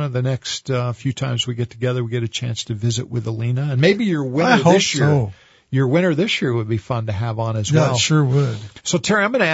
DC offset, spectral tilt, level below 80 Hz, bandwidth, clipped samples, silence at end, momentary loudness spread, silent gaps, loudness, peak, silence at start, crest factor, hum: under 0.1%; -5 dB/octave; -52 dBFS; 8 kHz; under 0.1%; 0 s; 9 LU; none; -19 LUFS; 0 dBFS; 0 s; 18 dB; none